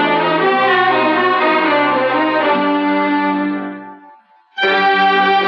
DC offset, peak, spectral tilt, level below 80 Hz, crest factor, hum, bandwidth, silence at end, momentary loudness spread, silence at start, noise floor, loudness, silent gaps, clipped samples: under 0.1%; -2 dBFS; -6.5 dB/octave; -64 dBFS; 12 dB; none; 6.6 kHz; 0 s; 8 LU; 0 s; -46 dBFS; -14 LUFS; none; under 0.1%